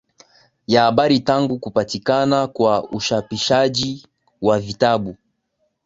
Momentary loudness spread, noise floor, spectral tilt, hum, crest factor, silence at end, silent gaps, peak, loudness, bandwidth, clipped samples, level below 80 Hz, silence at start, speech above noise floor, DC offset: 7 LU; -70 dBFS; -5 dB/octave; none; 18 dB; 0.7 s; none; -2 dBFS; -18 LUFS; 7.8 kHz; under 0.1%; -52 dBFS; 0.7 s; 52 dB; under 0.1%